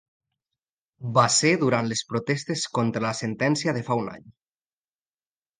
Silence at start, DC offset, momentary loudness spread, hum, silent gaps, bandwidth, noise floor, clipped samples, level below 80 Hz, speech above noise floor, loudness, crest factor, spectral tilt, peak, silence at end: 1 s; under 0.1%; 9 LU; none; none; 10 kHz; under -90 dBFS; under 0.1%; -66 dBFS; over 66 dB; -24 LUFS; 22 dB; -4 dB/octave; -4 dBFS; 1.3 s